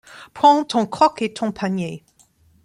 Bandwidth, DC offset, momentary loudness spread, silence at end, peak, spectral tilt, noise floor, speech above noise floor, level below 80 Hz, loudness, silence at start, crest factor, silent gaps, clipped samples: 11.5 kHz; under 0.1%; 16 LU; 0.65 s; -2 dBFS; -5.5 dB/octave; -57 dBFS; 38 dB; -60 dBFS; -19 LUFS; 0.15 s; 18 dB; none; under 0.1%